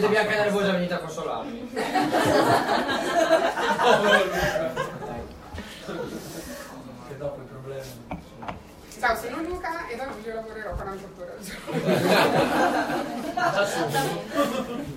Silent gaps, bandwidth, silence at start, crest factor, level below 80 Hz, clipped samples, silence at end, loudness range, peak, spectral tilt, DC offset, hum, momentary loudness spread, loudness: none; 16 kHz; 0 s; 22 dB; -50 dBFS; under 0.1%; 0 s; 14 LU; -4 dBFS; -4.5 dB/octave; under 0.1%; none; 18 LU; -24 LUFS